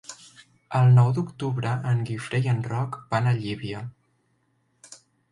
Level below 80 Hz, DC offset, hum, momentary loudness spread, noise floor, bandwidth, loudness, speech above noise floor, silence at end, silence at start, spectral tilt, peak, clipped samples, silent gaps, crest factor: -60 dBFS; under 0.1%; none; 17 LU; -69 dBFS; 11 kHz; -24 LUFS; 46 dB; 0.35 s; 0.1 s; -7 dB/octave; -8 dBFS; under 0.1%; none; 18 dB